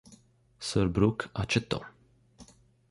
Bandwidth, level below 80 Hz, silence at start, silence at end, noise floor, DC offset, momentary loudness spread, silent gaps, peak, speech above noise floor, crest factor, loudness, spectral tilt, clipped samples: 11.5 kHz; -50 dBFS; 0.1 s; 0.45 s; -60 dBFS; under 0.1%; 12 LU; none; -10 dBFS; 31 dB; 22 dB; -30 LUFS; -5.5 dB/octave; under 0.1%